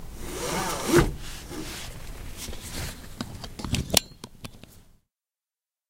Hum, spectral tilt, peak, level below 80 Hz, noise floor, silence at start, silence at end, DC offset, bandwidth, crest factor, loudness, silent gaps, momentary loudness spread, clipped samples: none; -3.5 dB/octave; 0 dBFS; -40 dBFS; under -90 dBFS; 0 s; 1 s; under 0.1%; 16.5 kHz; 30 dB; -29 LUFS; none; 20 LU; under 0.1%